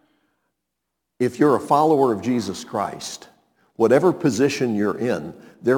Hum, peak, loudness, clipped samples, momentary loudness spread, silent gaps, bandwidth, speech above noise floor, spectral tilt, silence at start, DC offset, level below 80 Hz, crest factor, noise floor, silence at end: none; -4 dBFS; -20 LUFS; under 0.1%; 12 LU; none; 18.5 kHz; 60 dB; -6 dB/octave; 1.2 s; under 0.1%; -64 dBFS; 18 dB; -80 dBFS; 0 s